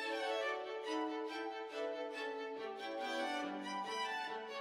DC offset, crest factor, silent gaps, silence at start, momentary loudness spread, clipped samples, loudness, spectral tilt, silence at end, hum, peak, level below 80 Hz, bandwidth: under 0.1%; 14 dB; none; 0 s; 5 LU; under 0.1%; -42 LUFS; -2.5 dB/octave; 0 s; none; -28 dBFS; -86 dBFS; 15.5 kHz